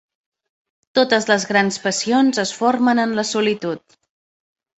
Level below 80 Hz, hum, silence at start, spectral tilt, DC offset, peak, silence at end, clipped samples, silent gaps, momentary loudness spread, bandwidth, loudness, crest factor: -64 dBFS; none; 0.95 s; -3.5 dB/octave; under 0.1%; -2 dBFS; 1 s; under 0.1%; none; 6 LU; 8.2 kHz; -18 LUFS; 18 dB